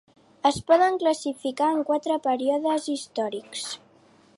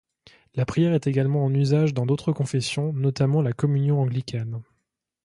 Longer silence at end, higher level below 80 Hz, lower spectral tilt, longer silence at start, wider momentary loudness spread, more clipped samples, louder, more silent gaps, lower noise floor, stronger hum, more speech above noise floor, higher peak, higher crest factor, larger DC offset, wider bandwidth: about the same, 0.6 s vs 0.6 s; about the same, -62 dBFS vs -58 dBFS; second, -4 dB/octave vs -7.5 dB/octave; about the same, 0.45 s vs 0.55 s; first, 13 LU vs 9 LU; neither; about the same, -25 LUFS vs -23 LUFS; neither; second, -57 dBFS vs -77 dBFS; neither; second, 33 dB vs 55 dB; about the same, -8 dBFS vs -8 dBFS; about the same, 18 dB vs 14 dB; neither; about the same, 11.5 kHz vs 11 kHz